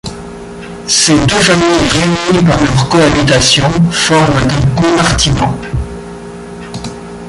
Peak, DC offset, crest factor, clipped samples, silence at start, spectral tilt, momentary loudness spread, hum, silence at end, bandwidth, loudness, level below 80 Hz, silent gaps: 0 dBFS; under 0.1%; 10 dB; under 0.1%; 0.05 s; -4 dB/octave; 19 LU; none; 0 s; 11.5 kHz; -9 LUFS; -28 dBFS; none